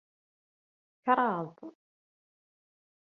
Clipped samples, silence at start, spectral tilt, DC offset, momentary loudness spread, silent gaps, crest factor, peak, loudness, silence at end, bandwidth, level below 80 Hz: under 0.1%; 1.05 s; -4.5 dB/octave; under 0.1%; 23 LU; none; 26 dB; -10 dBFS; -30 LUFS; 1.45 s; 4.9 kHz; -86 dBFS